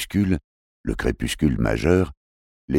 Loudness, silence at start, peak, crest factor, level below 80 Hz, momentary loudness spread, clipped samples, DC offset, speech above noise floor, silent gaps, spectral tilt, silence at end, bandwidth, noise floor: -23 LUFS; 0 s; -4 dBFS; 18 dB; -34 dBFS; 9 LU; under 0.1%; under 0.1%; over 69 dB; 0.44-0.84 s, 2.17-2.68 s; -6 dB/octave; 0 s; 16.5 kHz; under -90 dBFS